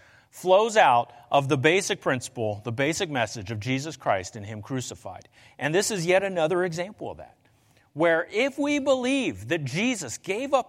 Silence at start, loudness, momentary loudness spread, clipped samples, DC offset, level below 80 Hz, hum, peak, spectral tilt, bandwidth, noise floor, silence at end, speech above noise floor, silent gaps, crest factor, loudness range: 0.35 s; -25 LUFS; 13 LU; under 0.1%; under 0.1%; -64 dBFS; none; -4 dBFS; -4.5 dB/octave; 16 kHz; -61 dBFS; 0.05 s; 36 dB; none; 20 dB; 6 LU